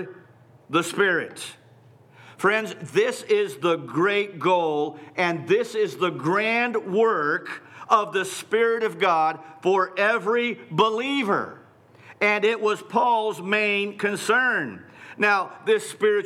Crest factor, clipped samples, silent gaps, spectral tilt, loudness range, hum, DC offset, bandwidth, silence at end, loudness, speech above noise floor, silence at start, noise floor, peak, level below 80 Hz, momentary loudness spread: 16 dB; under 0.1%; none; -4.5 dB/octave; 2 LU; none; under 0.1%; 15 kHz; 0 s; -23 LUFS; 30 dB; 0 s; -53 dBFS; -6 dBFS; -80 dBFS; 6 LU